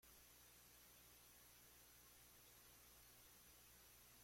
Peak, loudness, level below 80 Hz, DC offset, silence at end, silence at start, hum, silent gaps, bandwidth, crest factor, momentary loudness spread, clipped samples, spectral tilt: -56 dBFS; -66 LUFS; -80 dBFS; under 0.1%; 0 s; 0 s; 60 Hz at -80 dBFS; none; 16.5 kHz; 12 dB; 0 LU; under 0.1%; -1.5 dB/octave